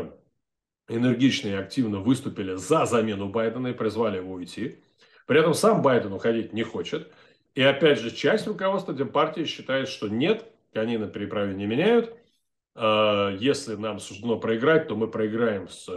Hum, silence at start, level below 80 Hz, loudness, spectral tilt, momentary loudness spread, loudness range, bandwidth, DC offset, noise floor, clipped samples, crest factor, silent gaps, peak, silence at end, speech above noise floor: none; 0 s; -68 dBFS; -25 LUFS; -5.5 dB/octave; 12 LU; 3 LU; 12.5 kHz; under 0.1%; -84 dBFS; under 0.1%; 18 dB; none; -6 dBFS; 0 s; 60 dB